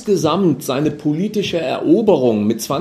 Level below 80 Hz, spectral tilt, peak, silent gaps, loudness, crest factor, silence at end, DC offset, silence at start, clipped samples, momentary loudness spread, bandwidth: -54 dBFS; -6 dB/octave; 0 dBFS; none; -17 LUFS; 16 dB; 0 s; under 0.1%; 0 s; under 0.1%; 6 LU; 14 kHz